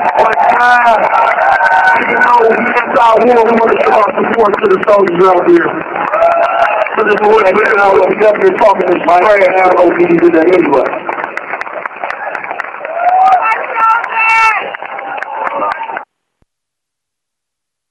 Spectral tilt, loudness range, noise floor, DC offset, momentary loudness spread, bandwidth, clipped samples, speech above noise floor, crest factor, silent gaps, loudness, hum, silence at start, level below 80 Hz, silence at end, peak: -5.5 dB/octave; 5 LU; -78 dBFS; under 0.1%; 12 LU; 11 kHz; under 0.1%; 70 dB; 10 dB; none; -9 LUFS; none; 0 s; -50 dBFS; 1.85 s; 0 dBFS